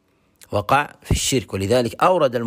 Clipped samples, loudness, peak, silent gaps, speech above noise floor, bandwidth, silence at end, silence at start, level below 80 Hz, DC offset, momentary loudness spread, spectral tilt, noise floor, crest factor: under 0.1%; -20 LUFS; -4 dBFS; none; 34 dB; 16 kHz; 0 s; 0.5 s; -36 dBFS; under 0.1%; 7 LU; -4.5 dB/octave; -53 dBFS; 16 dB